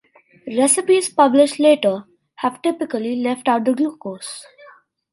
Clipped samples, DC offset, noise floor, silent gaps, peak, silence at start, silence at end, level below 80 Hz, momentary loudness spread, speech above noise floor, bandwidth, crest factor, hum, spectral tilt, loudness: under 0.1%; under 0.1%; -48 dBFS; none; 0 dBFS; 0.45 s; 0.7 s; -72 dBFS; 16 LU; 31 dB; 11.5 kHz; 18 dB; none; -3 dB/octave; -18 LUFS